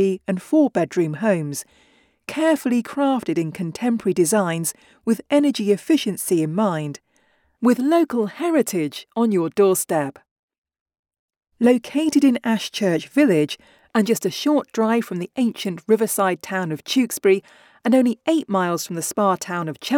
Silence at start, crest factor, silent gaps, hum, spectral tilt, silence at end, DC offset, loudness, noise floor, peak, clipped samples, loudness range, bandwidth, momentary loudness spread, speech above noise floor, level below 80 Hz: 0 s; 16 dB; 10.31-10.48 s, 10.58-10.64 s, 10.81-10.86 s, 10.99-11.03 s, 11.19-11.28 s; none; -5 dB/octave; 0 s; under 0.1%; -21 LUFS; -62 dBFS; -6 dBFS; under 0.1%; 2 LU; 19 kHz; 8 LU; 43 dB; -68 dBFS